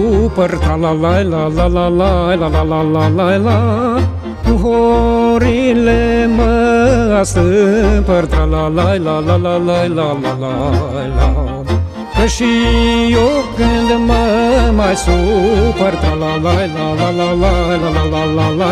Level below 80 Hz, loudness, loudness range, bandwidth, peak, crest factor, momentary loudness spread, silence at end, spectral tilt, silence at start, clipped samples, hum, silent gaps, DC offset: -20 dBFS; -13 LUFS; 3 LU; 12.5 kHz; 0 dBFS; 12 dB; 5 LU; 0 s; -6.5 dB/octave; 0 s; under 0.1%; none; none; under 0.1%